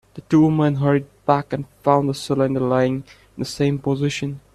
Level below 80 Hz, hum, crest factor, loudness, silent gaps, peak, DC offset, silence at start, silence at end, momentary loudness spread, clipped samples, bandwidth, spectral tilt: -52 dBFS; none; 18 dB; -20 LUFS; none; -2 dBFS; under 0.1%; 0.15 s; 0.15 s; 12 LU; under 0.1%; 13 kHz; -7 dB/octave